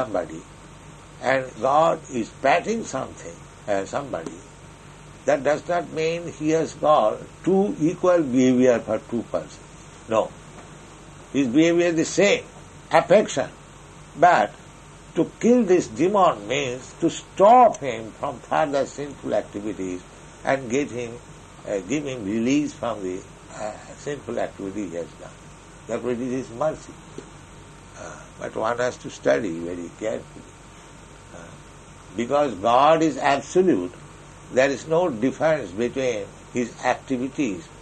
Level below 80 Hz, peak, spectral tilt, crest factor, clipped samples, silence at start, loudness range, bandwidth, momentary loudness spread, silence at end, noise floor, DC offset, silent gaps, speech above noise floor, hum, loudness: -54 dBFS; -2 dBFS; -5 dB/octave; 22 dB; under 0.1%; 0 s; 9 LU; 9.6 kHz; 22 LU; 0 s; -45 dBFS; under 0.1%; none; 22 dB; none; -23 LUFS